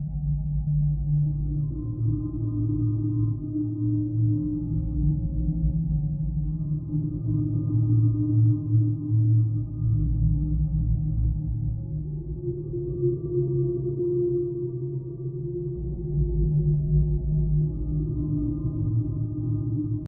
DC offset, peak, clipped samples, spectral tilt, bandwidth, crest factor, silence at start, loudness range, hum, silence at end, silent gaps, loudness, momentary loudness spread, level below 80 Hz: under 0.1%; -12 dBFS; under 0.1%; -19 dB/octave; 1.3 kHz; 14 dB; 0 s; 4 LU; none; 0 s; none; -26 LUFS; 8 LU; -32 dBFS